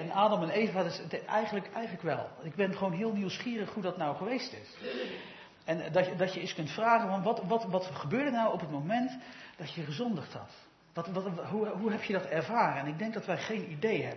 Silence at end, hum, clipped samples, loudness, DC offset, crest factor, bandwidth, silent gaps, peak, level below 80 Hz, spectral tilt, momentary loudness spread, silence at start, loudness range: 0 s; none; under 0.1%; -33 LUFS; under 0.1%; 20 dB; 6.2 kHz; none; -12 dBFS; -78 dBFS; -4.5 dB/octave; 12 LU; 0 s; 5 LU